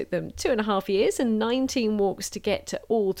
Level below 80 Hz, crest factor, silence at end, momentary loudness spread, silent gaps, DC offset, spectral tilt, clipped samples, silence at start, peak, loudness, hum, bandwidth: -52 dBFS; 14 dB; 0 s; 5 LU; none; under 0.1%; -4.5 dB/octave; under 0.1%; 0 s; -12 dBFS; -26 LUFS; none; 17 kHz